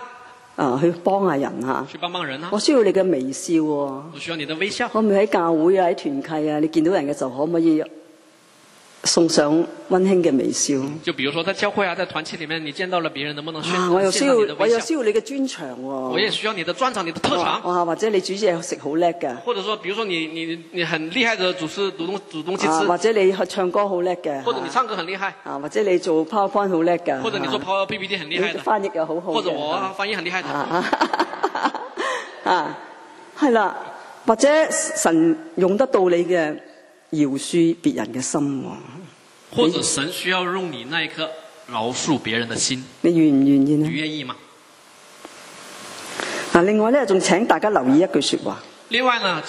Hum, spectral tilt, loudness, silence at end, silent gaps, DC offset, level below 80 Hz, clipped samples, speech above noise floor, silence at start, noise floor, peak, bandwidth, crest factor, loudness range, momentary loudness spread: none; -4 dB/octave; -21 LUFS; 0 s; none; under 0.1%; -66 dBFS; under 0.1%; 31 dB; 0 s; -51 dBFS; 0 dBFS; 12.5 kHz; 20 dB; 4 LU; 11 LU